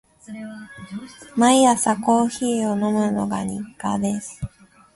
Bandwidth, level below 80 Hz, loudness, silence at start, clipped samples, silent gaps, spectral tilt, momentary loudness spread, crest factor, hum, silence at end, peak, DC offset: 11.5 kHz; -52 dBFS; -20 LUFS; 0.3 s; under 0.1%; none; -4.5 dB/octave; 20 LU; 20 dB; none; 0.5 s; -2 dBFS; under 0.1%